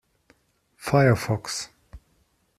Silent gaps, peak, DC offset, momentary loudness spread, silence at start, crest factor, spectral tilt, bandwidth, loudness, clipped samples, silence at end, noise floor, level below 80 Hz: none; -6 dBFS; under 0.1%; 17 LU; 0.8 s; 22 dB; -5.5 dB/octave; 14.5 kHz; -23 LUFS; under 0.1%; 0.6 s; -67 dBFS; -54 dBFS